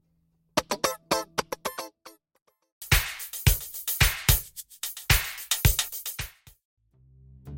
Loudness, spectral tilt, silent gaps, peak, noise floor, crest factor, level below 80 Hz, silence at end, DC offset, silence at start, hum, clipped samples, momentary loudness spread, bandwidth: -26 LUFS; -3 dB/octave; 2.42-2.46 s, 2.72-2.81 s, 6.65-6.77 s; -6 dBFS; -70 dBFS; 24 dB; -36 dBFS; 0 s; under 0.1%; 0.55 s; none; under 0.1%; 13 LU; 17 kHz